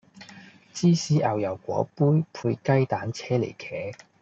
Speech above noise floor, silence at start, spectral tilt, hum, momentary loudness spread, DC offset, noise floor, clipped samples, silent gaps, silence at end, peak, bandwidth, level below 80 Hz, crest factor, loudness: 24 dB; 0.15 s; -6.5 dB/octave; none; 13 LU; under 0.1%; -49 dBFS; under 0.1%; none; 0.25 s; -8 dBFS; 8 kHz; -66 dBFS; 18 dB; -25 LUFS